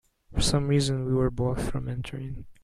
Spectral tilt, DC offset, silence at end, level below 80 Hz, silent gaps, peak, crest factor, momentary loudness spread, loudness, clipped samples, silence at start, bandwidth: -5.5 dB/octave; under 0.1%; 0.1 s; -38 dBFS; none; -10 dBFS; 18 dB; 12 LU; -28 LUFS; under 0.1%; 0.3 s; 13 kHz